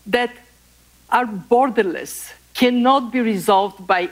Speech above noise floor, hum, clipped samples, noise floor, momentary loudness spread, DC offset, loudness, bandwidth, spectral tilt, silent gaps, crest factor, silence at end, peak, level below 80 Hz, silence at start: 35 dB; 60 Hz at -55 dBFS; under 0.1%; -53 dBFS; 12 LU; under 0.1%; -18 LUFS; 16 kHz; -4.5 dB/octave; none; 14 dB; 0 s; -4 dBFS; -56 dBFS; 0.05 s